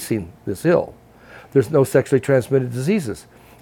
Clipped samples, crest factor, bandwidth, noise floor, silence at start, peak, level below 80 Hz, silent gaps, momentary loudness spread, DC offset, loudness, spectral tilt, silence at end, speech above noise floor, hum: under 0.1%; 18 dB; 17.5 kHz; -44 dBFS; 0 s; -2 dBFS; -52 dBFS; none; 13 LU; under 0.1%; -19 LUFS; -7 dB/octave; 0.4 s; 25 dB; none